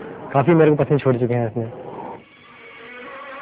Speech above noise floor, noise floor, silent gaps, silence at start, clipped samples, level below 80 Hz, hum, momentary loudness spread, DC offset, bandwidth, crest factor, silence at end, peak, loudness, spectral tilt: 28 dB; -45 dBFS; none; 0 s; under 0.1%; -56 dBFS; none; 23 LU; under 0.1%; 4 kHz; 18 dB; 0 s; -2 dBFS; -18 LUFS; -12 dB/octave